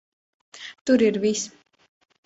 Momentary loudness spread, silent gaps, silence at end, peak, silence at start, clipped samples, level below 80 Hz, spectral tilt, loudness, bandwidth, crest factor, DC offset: 20 LU; 0.81-0.85 s; 0.8 s; -6 dBFS; 0.55 s; under 0.1%; -66 dBFS; -4 dB/octave; -22 LUFS; 8 kHz; 18 dB; under 0.1%